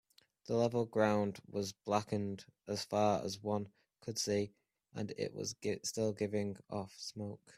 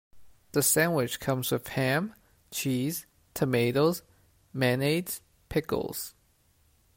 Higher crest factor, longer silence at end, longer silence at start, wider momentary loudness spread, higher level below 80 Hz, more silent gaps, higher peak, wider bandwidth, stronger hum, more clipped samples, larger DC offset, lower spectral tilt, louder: about the same, 22 dB vs 18 dB; second, 0.05 s vs 0.85 s; first, 0.5 s vs 0.15 s; about the same, 12 LU vs 14 LU; second, -74 dBFS vs -60 dBFS; neither; second, -16 dBFS vs -12 dBFS; about the same, 15 kHz vs 16.5 kHz; neither; neither; neither; about the same, -5 dB/octave vs -4.5 dB/octave; second, -38 LUFS vs -29 LUFS